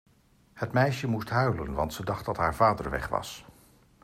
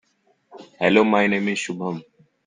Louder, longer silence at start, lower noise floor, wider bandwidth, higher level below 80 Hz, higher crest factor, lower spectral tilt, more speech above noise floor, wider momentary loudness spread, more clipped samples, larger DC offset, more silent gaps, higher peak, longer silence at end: second, -28 LUFS vs -20 LUFS; about the same, 0.55 s vs 0.55 s; about the same, -62 dBFS vs -64 dBFS; first, 15 kHz vs 9.6 kHz; first, -48 dBFS vs -64 dBFS; about the same, 20 dB vs 20 dB; about the same, -6 dB/octave vs -5 dB/octave; second, 34 dB vs 44 dB; second, 9 LU vs 13 LU; neither; neither; neither; second, -10 dBFS vs -2 dBFS; first, 0.6 s vs 0.45 s